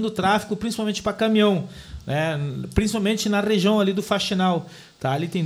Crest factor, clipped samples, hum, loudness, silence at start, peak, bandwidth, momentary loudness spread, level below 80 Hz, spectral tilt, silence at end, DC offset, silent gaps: 18 dB; under 0.1%; none; -22 LUFS; 0 s; -6 dBFS; 15.5 kHz; 9 LU; -42 dBFS; -5.5 dB/octave; 0 s; under 0.1%; none